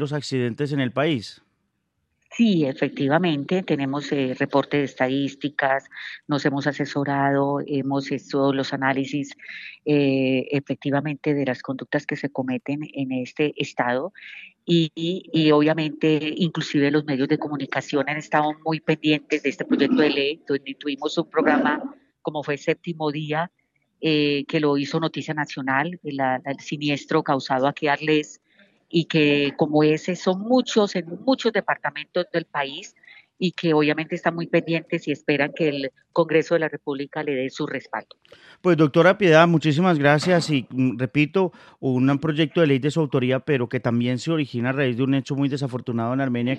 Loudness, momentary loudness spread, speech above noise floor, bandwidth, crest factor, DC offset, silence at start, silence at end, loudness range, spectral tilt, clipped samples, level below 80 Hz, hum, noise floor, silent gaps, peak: -23 LUFS; 9 LU; 52 dB; 9.2 kHz; 22 dB; under 0.1%; 0 s; 0 s; 5 LU; -6.5 dB/octave; under 0.1%; -70 dBFS; none; -74 dBFS; none; -2 dBFS